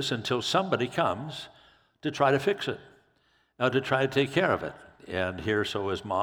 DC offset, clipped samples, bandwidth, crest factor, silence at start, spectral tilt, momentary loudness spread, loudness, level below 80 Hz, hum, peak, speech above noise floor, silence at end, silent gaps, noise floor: under 0.1%; under 0.1%; 18 kHz; 20 dB; 0 s; -5 dB/octave; 14 LU; -28 LUFS; -62 dBFS; none; -8 dBFS; 40 dB; 0 s; none; -68 dBFS